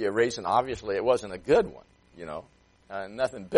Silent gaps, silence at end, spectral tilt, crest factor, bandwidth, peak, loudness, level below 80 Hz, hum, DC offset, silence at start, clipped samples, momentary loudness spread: none; 0 s; -5 dB/octave; 20 dB; 11.5 kHz; -8 dBFS; -27 LUFS; -56 dBFS; none; under 0.1%; 0 s; under 0.1%; 15 LU